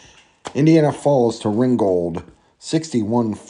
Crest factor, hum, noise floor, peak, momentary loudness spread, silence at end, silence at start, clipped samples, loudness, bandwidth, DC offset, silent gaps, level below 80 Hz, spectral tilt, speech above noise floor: 16 dB; none; -38 dBFS; -2 dBFS; 14 LU; 0.1 s; 0.45 s; under 0.1%; -18 LUFS; 11 kHz; under 0.1%; none; -56 dBFS; -7 dB/octave; 21 dB